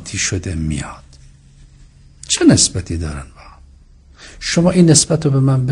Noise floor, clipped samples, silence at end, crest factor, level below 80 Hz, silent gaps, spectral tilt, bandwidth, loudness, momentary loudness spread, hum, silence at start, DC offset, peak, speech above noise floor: -44 dBFS; under 0.1%; 0 s; 16 dB; -36 dBFS; none; -4.5 dB/octave; 11 kHz; -14 LUFS; 15 LU; none; 0 s; under 0.1%; 0 dBFS; 30 dB